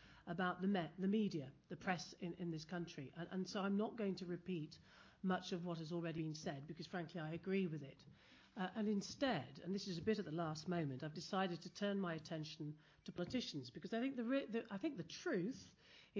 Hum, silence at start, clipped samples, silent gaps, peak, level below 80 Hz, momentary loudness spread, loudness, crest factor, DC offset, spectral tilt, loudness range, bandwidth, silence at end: none; 0 s; under 0.1%; none; -28 dBFS; -76 dBFS; 10 LU; -45 LUFS; 16 dB; under 0.1%; -6 dB/octave; 3 LU; 7.6 kHz; 0 s